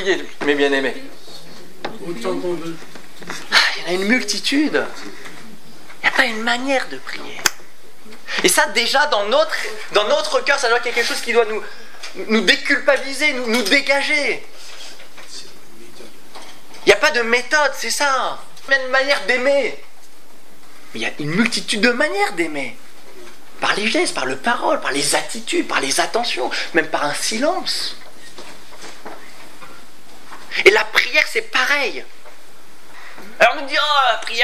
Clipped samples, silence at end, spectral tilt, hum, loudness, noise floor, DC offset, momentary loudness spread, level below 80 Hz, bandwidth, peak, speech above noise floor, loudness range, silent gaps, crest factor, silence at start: under 0.1%; 0 s; -2 dB/octave; none; -17 LUFS; -48 dBFS; 5%; 22 LU; -60 dBFS; 16 kHz; 0 dBFS; 29 dB; 5 LU; none; 20 dB; 0 s